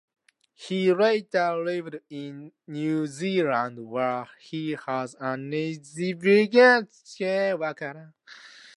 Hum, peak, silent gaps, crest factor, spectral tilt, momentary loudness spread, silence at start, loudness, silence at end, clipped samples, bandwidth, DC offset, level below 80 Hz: none; -6 dBFS; none; 20 dB; -5.5 dB/octave; 19 LU; 0.6 s; -25 LUFS; 0.3 s; under 0.1%; 11.5 kHz; under 0.1%; -78 dBFS